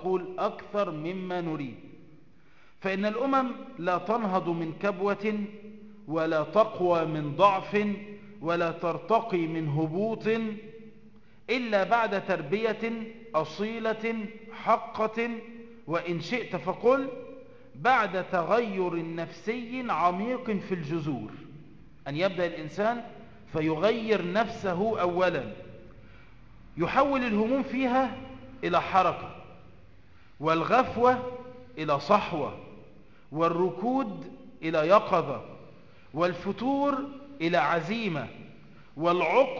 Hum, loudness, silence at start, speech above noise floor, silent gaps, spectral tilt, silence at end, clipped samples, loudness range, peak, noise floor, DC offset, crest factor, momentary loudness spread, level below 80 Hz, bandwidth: none; -28 LUFS; 0 s; 33 dB; none; -7 dB/octave; 0 s; under 0.1%; 4 LU; -8 dBFS; -60 dBFS; 0.3%; 22 dB; 16 LU; -60 dBFS; 7.4 kHz